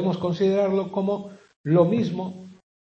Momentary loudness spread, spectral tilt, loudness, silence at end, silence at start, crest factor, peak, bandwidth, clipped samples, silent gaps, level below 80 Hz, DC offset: 16 LU; -8.5 dB/octave; -23 LUFS; 0.45 s; 0 s; 18 dB; -6 dBFS; 7.2 kHz; under 0.1%; 1.56-1.64 s; -66 dBFS; under 0.1%